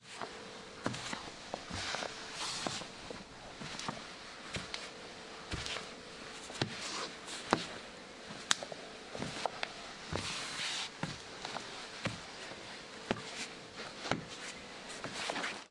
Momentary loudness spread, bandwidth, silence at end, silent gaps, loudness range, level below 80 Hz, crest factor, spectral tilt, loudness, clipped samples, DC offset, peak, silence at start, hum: 11 LU; 11.5 kHz; 0 s; none; 4 LU; -64 dBFS; 38 dB; -2.5 dB/octave; -41 LUFS; under 0.1%; under 0.1%; -4 dBFS; 0 s; none